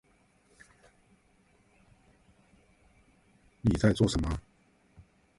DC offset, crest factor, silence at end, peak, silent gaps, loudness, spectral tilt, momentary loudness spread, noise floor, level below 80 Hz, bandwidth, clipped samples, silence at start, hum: under 0.1%; 24 dB; 1 s; -10 dBFS; none; -29 LUFS; -6.5 dB/octave; 10 LU; -66 dBFS; -46 dBFS; 11.5 kHz; under 0.1%; 3.65 s; none